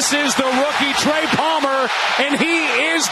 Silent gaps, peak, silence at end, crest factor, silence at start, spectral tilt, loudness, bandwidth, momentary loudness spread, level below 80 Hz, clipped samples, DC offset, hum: none; -2 dBFS; 0 s; 14 dB; 0 s; -2 dB/octave; -16 LUFS; 13 kHz; 2 LU; -56 dBFS; under 0.1%; under 0.1%; none